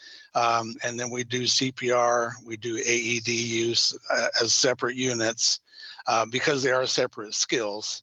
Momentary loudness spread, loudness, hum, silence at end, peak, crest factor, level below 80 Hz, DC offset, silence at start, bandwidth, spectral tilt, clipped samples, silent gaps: 9 LU; -25 LUFS; none; 0.05 s; -8 dBFS; 18 dB; -72 dBFS; under 0.1%; 0 s; 9 kHz; -2 dB/octave; under 0.1%; none